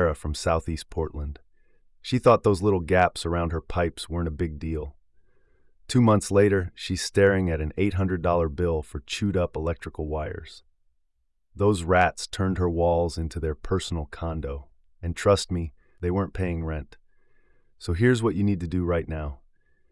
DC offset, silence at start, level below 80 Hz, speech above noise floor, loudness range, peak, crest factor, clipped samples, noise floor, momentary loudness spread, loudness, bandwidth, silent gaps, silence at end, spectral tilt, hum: under 0.1%; 0 s; -42 dBFS; 45 dB; 5 LU; -8 dBFS; 18 dB; under 0.1%; -70 dBFS; 13 LU; -25 LUFS; 12 kHz; none; 0.55 s; -6 dB/octave; none